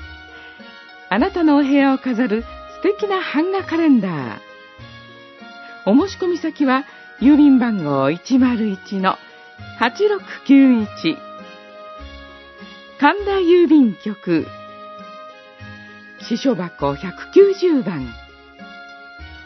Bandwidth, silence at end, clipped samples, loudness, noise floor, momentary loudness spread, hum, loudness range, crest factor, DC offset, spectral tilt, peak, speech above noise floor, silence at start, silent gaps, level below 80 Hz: 6.2 kHz; 0 s; under 0.1%; -17 LUFS; -41 dBFS; 25 LU; none; 4 LU; 18 dB; under 0.1%; -6.5 dB/octave; 0 dBFS; 25 dB; 0 s; none; -48 dBFS